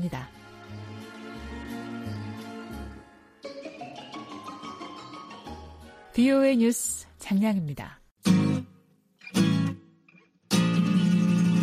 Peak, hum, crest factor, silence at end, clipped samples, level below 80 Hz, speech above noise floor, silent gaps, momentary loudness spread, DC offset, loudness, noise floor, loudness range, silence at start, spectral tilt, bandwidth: -10 dBFS; none; 18 dB; 0 s; under 0.1%; -54 dBFS; 36 dB; 8.11-8.16 s; 21 LU; under 0.1%; -26 LUFS; -60 dBFS; 15 LU; 0 s; -6 dB/octave; 15.5 kHz